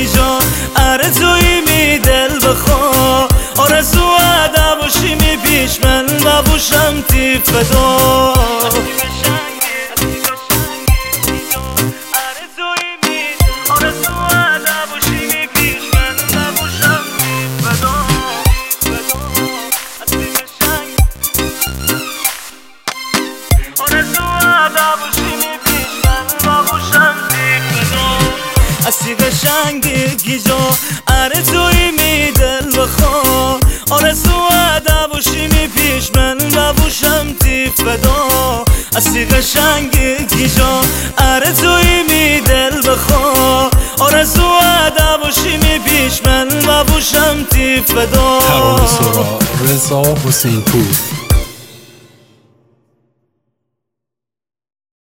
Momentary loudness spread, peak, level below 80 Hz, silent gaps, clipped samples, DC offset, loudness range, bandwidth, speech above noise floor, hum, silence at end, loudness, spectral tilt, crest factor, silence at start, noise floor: 6 LU; 0 dBFS; -20 dBFS; none; under 0.1%; under 0.1%; 5 LU; 17 kHz; 74 dB; none; 3.2 s; -11 LUFS; -3.5 dB/octave; 12 dB; 0 s; -84 dBFS